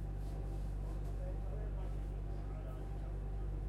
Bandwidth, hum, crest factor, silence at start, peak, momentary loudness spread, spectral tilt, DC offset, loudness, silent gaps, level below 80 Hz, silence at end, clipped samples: 5.4 kHz; none; 10 dB; 0 s; -32 dBFS; 2 LU; -8.5 dB/octave; under 0.1%; -44 LUFS; none; -42 dBFS; 0 s; under 0.1%